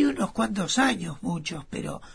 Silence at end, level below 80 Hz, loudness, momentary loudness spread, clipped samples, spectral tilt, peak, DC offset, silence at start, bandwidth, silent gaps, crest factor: 0 s; -52 dBFS; -27 LUFS; 11 LU; under 0.1%; -4 dB/octave; -10 dBFS; 0.2%; 0 s; 11 kHz; none; 18 dB